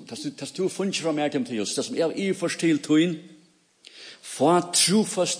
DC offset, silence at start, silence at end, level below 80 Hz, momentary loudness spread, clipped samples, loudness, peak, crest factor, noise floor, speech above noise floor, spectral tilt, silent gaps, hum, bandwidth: under 0.1%; 0 s; 0 s; -76 dBFS; 17 LU; under 0.1%; -24 LUFS; -8 dBFS; 16 dB; -58 dBFS; 34 dB; -3.5 dB/octave; none; none; 10.5 kHz